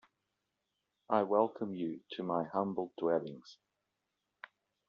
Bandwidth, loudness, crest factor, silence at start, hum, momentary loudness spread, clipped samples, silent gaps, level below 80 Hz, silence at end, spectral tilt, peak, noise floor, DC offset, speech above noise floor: 7 kHz; -35 LUFS; 24 dB; 1.1 s; none; 24 LU; under 0.1%; none; -84 dBFS; 1.35 s; -5.5 dB/octave; -14 dBFS; -86 dBFS; under 0.1%; 51 dB